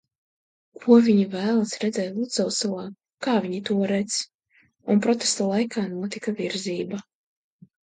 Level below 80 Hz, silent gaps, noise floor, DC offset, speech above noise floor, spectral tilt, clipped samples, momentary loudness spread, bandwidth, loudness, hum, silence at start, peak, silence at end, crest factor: -70 dBFS; 3.14-3.18 s, 4.34-4.39 s; -63 dBFS; under 0.1%; 40 dB; -4.5 dB/octave; under 0.1%; 13 LU; 9.4 kHz; -24 LUFS; none; 0.8 s; -4 dBFS; 0.8 s; 20 dB